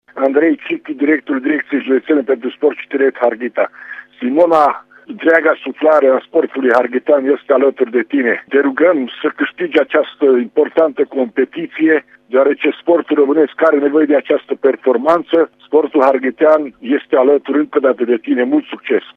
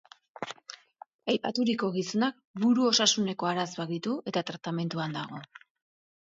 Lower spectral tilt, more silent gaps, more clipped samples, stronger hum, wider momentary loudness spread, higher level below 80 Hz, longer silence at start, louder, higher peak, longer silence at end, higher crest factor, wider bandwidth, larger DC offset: first, -6.5 dB/octave vs -4 dB/octave; second, none vs 1.14-1.19 s, 2.45-2.54 s; neither; neither; second, 7 LU vs 18 LU; first, -68 dBFS vs -76 dBFS; second, 0.15 s vs 0.4 s; first, -14 LUFS vs -29 LUFS; first, 0 dBFS vs -8 dBFS; second, 0.15 s vs 0.75 s; second, 14 dB vs 22 dB; second, 5.6 kHz vs 7.8 kHz; neither